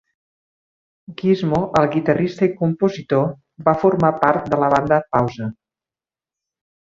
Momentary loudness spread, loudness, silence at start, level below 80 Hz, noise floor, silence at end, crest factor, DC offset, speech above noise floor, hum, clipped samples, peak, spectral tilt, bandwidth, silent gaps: 8 LU; -18 LUFS; 1.1 s; -52 dBFS; under -90 dBFS; 1.3 s; 20 dB; under 0.1%; over 72 dB; none; under 0.1%; 0 dBFS; -8 dB/octave; 7.6 kHz; none